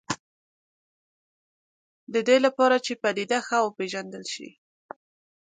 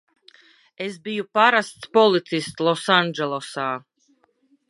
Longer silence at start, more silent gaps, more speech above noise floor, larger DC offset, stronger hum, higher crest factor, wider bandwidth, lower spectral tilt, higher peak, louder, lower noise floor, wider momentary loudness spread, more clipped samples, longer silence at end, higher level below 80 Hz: second, 0.1 s vs 0.8 s; first, 0.20-2.07 s vs none; first, over 66 dB vs 43 dB; neither; neither; about the same, 20 dB vs 22 dB; second, 9.4 kHz vs 11.5 kHz; about the same, -3.5 dB/octave vs -4.5 dB/octave; second, -8 dBFS vs -2 dBFS; second, -25 LUFS vs -21 LUFS; first, under -90 dBFS vs -64 dBFS; about the same, 14 LU vs 13 LU; neither; about the same, 0.95 s vs 0.9 s; about the same, -74 dBFS vs -72 dBFS